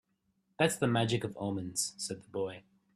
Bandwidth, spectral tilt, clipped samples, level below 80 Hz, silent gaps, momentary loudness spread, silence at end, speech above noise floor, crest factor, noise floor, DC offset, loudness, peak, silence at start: 15 kHz; -4 dB/octave; under 0.1%; -68 dBFS; none; 10 LU; 0.35 s; 44 dB; 22 dB; -77 dBFS; under 0.1%; -33 LUFS; -12 dBFS; 0.6 s